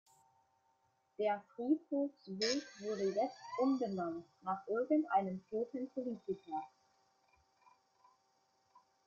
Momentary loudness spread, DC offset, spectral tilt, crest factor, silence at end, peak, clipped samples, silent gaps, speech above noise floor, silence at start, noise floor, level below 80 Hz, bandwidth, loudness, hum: 9 LU; under 0.1%; -5 dB/octave; 18 dB; 2.4 s; -22 dBFS; under 0.1%; none; 40 dB; 1.2 s; -78 dBFS; -84 dBFS; 7.6 kHz; -38 LUFS; none